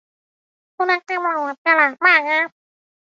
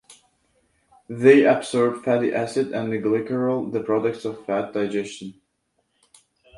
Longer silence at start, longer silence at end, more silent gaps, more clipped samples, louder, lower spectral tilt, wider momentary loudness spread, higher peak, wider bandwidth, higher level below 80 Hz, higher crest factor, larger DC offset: first, 0.8 s vs 0.1 s; second, 0.7 s vs 1.25 s; first, 1.58-1.65 s vs none; neither; first, -17 LUFS vs -21 LUFS; second, -2 dB/octave vs -6 dB/octave; second, 9 LU vs 15 LU; about the same, -2 dBFS vs -2 dBFS; second, 7.6 kHz vs 11.5 kHz; second, -78 dBFS vs -66 dBFS; about the same, 18 dB vs 22 dB; neither